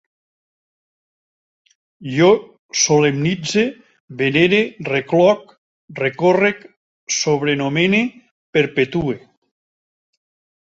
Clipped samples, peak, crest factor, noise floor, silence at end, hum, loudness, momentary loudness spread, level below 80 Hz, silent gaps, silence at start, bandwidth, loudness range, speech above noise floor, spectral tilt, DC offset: under 0.1%; 0 dBFS; 18 dB; under -90 dBFS; 1.45 s; none; -17 LUFS; 11 LU; -56 dBFS; 2.59-2.69 s, 4.00-4.08 s, 5.58-5.88 s, 6.77-7.07 s, 8.31-8.53 s; 2 s; 8 kHz; 3 LU; over 73 dB; -4.5 dB/octave; under 0.1%